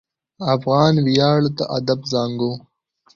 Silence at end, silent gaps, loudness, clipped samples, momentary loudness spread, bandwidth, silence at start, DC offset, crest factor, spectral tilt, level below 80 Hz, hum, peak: 0.55 s; none; -19 LUFS; under 0.1%; 10 LU; 7.6 kHz; 0.4 s; under 0.1%; 16 dB; -6.5 dB/octave; -54 dBFS; none; -2 dBFS